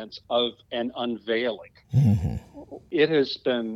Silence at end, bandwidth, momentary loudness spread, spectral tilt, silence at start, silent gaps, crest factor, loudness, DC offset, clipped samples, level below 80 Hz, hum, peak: 0 s; 7.8 kHz; 14 LU; -7.5 dB/octave; 0 s; none; 18 dB; -25 LUFS; under 0.1%; under 0.1%; -46 dBFS; none; -8 dBFS